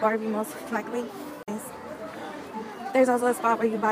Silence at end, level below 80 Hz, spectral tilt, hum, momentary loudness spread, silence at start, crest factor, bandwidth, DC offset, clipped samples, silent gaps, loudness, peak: 0 s; -70 dBFS; -5 dB/octave; none; 15 LU; 0 s; 18 dB; 15.5 kHz; under 0.1%; under 0.1%; none; -28 LUFS; -10 dBFS